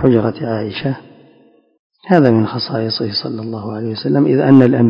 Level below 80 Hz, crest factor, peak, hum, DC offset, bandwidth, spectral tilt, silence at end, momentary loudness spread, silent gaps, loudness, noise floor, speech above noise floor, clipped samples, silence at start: -50 dBFS; 14 dB; 0 dBFS; none; under 0.1%; 5.4 kHz; -9.5 dB/octave; 0 s; 14 LU; 1.79-1.90 s; -15 LUFS; -50 dBFS; 37 dB; 0.4%; 0 s